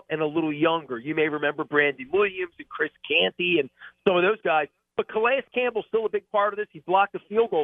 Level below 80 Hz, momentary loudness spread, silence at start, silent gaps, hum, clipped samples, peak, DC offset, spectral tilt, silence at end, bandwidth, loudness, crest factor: -68 dBFS; 8 LU; 0.1 s; none; none; under 0.1%; -6 dBFS; under 0.1%; -7.5 dB/octave; 0 s; 3.9 kHz; -25 LUFS; 20 dB